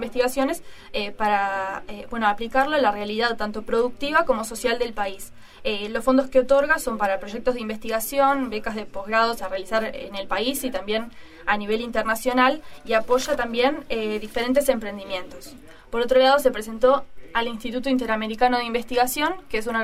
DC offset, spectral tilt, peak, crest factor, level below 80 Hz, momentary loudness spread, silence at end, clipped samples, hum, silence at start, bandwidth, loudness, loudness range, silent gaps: under 0.1%; -3.5 dB/octave; -4 dBFS; 20 dB; -44 dBFS; 11 LU; 0 s; under 0.1%; none; 0 s; 16 kHz; -23 LUFS; 2 LU; none